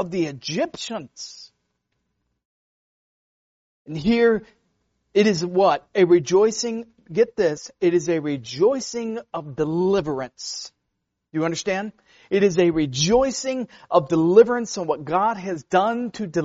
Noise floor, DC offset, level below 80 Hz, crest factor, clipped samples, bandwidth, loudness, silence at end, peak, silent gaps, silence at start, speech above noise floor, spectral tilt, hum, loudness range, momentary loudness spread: -78 dBFS; under 0.1%; -54 dBFS; 20 dB; under 0.1%; 8 kHz; -21 LUFS; 0 s; -2 dBFS; 2.45-3.85 s; 0 s; 57 dB; -4.5 dB/octave; none; 7 LU; 13 LU